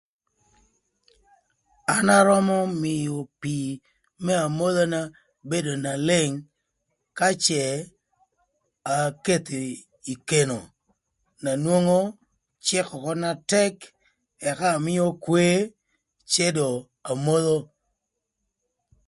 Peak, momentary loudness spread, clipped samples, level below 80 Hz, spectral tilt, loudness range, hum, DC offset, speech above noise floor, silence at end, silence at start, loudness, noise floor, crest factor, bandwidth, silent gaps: -4 dBFS; 13 LU; under 0.1%; -64 dBFS; -4.5 dB/octave; 4 LU; none; under 0.1%; 58 dB; 1.45 s; 1.9 s; -24 LUFS; -81 dBFS; 22 dB; 11.5 kHz; none